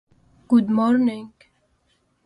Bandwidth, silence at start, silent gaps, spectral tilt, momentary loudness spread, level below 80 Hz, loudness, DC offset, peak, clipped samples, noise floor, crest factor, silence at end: 10.5 kHz; 0.5 s; none; -8 dB/octave; 8 LU; -62 dBFS; -20 LUFS; under 0.1%; -6 dBFS; under 0.1%; -66 dBFS; 16 dB; 1 s